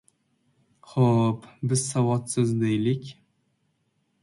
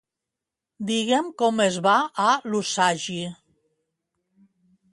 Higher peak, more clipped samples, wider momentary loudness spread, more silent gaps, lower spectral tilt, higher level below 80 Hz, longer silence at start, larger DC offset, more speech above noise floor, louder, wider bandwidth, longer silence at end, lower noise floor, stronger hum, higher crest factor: about the same, -8 dBFS vs -6 dBFS; neither; about the same, 10 LU vs 11 LU; neither; first, -6.5 dB/octave vs -3.5 dB/octave; first, -62 dBFS vs -72 dBFS; about the same, 0.9 s vs 0.8 s; neither; second, 48 dB vs 64 dB; second, -25 LUFS vs -22 LUFS; about the same, 11.5 kHz vs 11.5 kHz; second, 1.1 s vs 1.6 s; second, -72 dBFS vs -87 dBFS; neither; about the same, 18 dB vs 18 dB